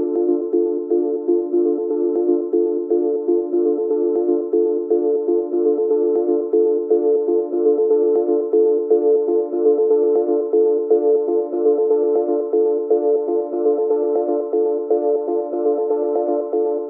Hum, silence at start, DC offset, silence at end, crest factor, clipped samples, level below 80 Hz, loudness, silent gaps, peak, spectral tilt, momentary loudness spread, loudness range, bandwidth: none; 0 s; under 0.1%; 0 s; 12 dB; under 0.1%; under -90 dBFS; -18 LUFS; none; -6 dBFS; -11.5 dB/octave; 4 LU; 2 LU; 1.7 kHz